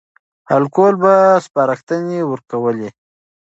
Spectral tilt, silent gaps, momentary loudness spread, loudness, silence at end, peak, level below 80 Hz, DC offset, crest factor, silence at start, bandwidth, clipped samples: -7.5 dB/octave; 1.83-1.87 s; 10 LU; -15 LUFS; 0.55 s; 0 dBFS; -68 dBFS; under 0.1%; 16 dB; 0.5 s; 8 kHz; under 0.1%